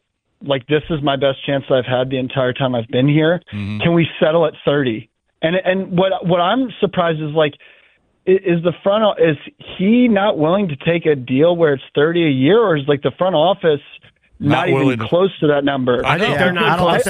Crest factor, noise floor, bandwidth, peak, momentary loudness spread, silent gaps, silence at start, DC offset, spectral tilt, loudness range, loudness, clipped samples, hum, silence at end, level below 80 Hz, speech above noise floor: 14 dB; -55 dBFS; 15 kHz; -2 dBFS; 6 LU; none; 0.4 s; under 0.1%; -7 dB/octave; 3 LU; -16 LUFS; under 0.1%; none; 0 s; -50 dBFS; 39 dB